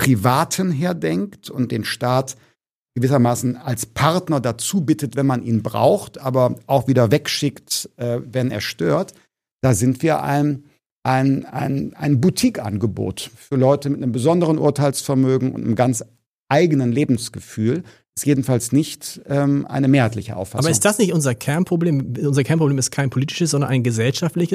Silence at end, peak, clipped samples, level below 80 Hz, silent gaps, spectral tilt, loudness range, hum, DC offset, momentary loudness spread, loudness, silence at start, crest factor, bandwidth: 0 s; 0 dBFS; under 0.1%; -54 dBFS; 2.71-2.85 s, 9.52-9.59 s, 10.86-11.02 s, 16.26-16.46 s, 18.09-18.13 s; -5.5 dB/octave; 2 LU; none; under 0.1%; 8 LU; -19 LUFS; 0 s; 18 dB; 15.5 kHz